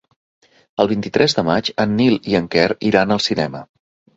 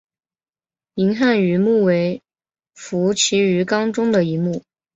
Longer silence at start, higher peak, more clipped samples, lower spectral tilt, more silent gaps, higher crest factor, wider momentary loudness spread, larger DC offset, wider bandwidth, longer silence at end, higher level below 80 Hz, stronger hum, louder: second, 0.8 s vs 0.95 s; first, 0 dBFS vs -4 dBFS; neither; about the same, -5.5 dB/octave vs -5 dB/octave; neither; about the same, 18 dB vs 14 dB; second, 6 LU vs 12 LU; neither; about the same, 8 kHz vs 8.2 kHz; first, 0.5 s vs 0.35 s; first, -50 dBFS vs -62 dBFS; neither; about the same, -17 LUFS vs -18 LUFS